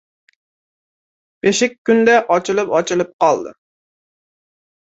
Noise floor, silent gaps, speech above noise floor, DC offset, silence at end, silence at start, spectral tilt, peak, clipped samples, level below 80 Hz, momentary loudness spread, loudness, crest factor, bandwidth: under -90 dBFS; 1.78-1.85 s, 3.13-3.19 s; over 75 dB; under 0.1%; 1.35 s; 1.45 s; -4 dB/octave; -2 dBFS; under 0.1%; -62 dBFS; 8 LU; -16 LUFS; 18 dB; 8.2 kHz